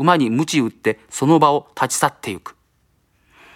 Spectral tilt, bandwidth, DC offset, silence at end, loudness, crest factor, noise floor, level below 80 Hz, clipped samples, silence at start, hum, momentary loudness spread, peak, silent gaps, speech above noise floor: -4.5 dB/octave; 16.5 kHz; under 0.1%; 1.05 s; -18 LUFS; 20 dB; -62 dBFS; -62 dBFS; under 0.1%; 0 s; none; 13 LU; 0 dBFS; none; 45 dB